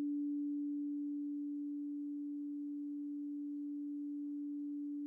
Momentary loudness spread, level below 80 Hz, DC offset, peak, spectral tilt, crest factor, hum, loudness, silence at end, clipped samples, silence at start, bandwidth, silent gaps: 4 LU; under -90 dBFS; under 0.1%; -34 dBFS; -9.5 dB/octave; 6 dB; none; -42 LUFS; 0 s; under 0.1%; 0 s; 0.7 kHz; none